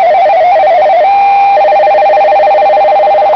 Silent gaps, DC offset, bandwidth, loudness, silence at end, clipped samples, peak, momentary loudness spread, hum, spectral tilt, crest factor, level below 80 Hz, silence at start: none; under 0.1%; 5.4 kHz; -6 LUFS; 0 s; under 0.1%; -2 dBFS; 0 LU; none; -4 dB/octave; 4 dB; -48 dBFS; 0 s